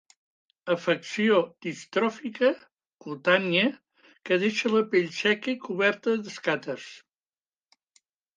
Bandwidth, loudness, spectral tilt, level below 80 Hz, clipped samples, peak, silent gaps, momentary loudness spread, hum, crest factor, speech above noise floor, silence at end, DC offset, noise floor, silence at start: 9.6 kHz; -26 LUFS; -5 dB/octave; -80 dBFS; under 0.1%; -6 dBFS; 2.94-2.99 s; 15 LU; none; 20 dB; over 64 dB; 1.4 s; under 0.1%; under -90 dBFS; 0.65 s